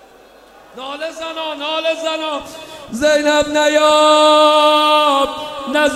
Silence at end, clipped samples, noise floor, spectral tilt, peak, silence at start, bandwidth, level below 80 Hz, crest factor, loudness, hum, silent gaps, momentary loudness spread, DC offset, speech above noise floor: 0 s; under 0.1%; -44 dBFS; -2 dB/octave; 0 dBFS; 0.75 s; 14.5 kHz; -50 dBFS; 14 dB; -13 LUFS; none; none; 16 LU; under 0.1%; 30 dB